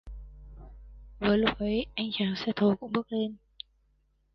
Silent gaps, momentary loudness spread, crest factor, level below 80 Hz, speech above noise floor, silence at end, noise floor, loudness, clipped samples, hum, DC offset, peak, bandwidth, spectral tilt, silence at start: none; 24 LU; 20 dB; -50 dBFS; 41 dB; 1 s; -70 dBFS; -29 LUFS; under 0.1%; none; under 0.1%; -10 dBFS; 6.2 kHz; -7.5 dB/octave; 0.05 s